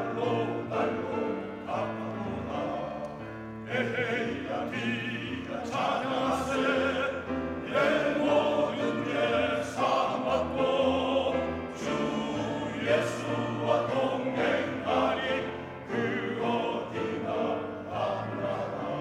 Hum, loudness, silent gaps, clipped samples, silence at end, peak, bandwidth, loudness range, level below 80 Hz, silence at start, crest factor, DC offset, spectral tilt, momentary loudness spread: none; -30 LUFS; none; under 0.1%; 0 s; -14 dBFS; 14 kHz; 5 LU; -62 dBFS; 0 s; 16 dB; under 0.1%; -5.5 dB/octave; 8 LU